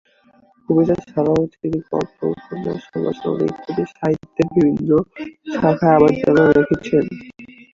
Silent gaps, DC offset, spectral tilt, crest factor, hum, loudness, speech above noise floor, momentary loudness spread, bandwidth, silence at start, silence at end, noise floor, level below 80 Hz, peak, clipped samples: none; under 0.1%; -8.5 dB/octave; 16 dB; none; -18 LUFS; 36 dB; 13 LU; 7.4 kHz; 0.7 s; 0.25 s; -54 dBFS; -48 dBFS; -2 dBFS; under 0.1%